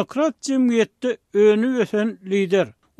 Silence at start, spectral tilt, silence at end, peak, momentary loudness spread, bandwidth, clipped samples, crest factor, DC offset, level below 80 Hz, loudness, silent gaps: 0 s; -5.5 dB/octave; 0.3 s; -6 dBFS; 7 LU; 11 kHz; under 0.1%; 14 dB; under 0.1%; -70 dBFS; -20 LUFS; none